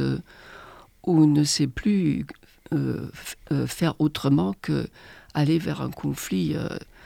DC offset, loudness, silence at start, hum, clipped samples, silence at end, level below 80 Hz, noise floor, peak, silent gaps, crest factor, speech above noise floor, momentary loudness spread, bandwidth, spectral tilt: under 0.1%; -25 LUFS; 0 s; none; under 0.1%; 0.25 s; -50 dBFS; -47 dBFS; -8 dBFS; none; 16 dB; 23 dB; 16 LU; 16.5 kHz; -6 dB/octave